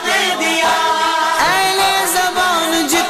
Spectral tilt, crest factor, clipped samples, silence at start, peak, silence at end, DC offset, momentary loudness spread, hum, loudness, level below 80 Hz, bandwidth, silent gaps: -1 dB/octave; 10 dB; under 0.1%; 0 s; -4 dBFS; 0 s; under 0.1%; 2 LU; none; -14 LUFS; -48 dBFS; 15.5 kHz; none